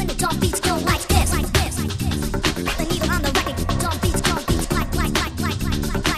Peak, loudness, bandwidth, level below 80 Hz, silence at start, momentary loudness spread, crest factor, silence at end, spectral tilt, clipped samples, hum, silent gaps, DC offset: -2 dBFS; -21 LUFS; 14 kHz; -28 dBFS; 0 s; 5 LU; 18 dB; 0 s; -4 dB/octave; under 0.1%; none; none; 0.3%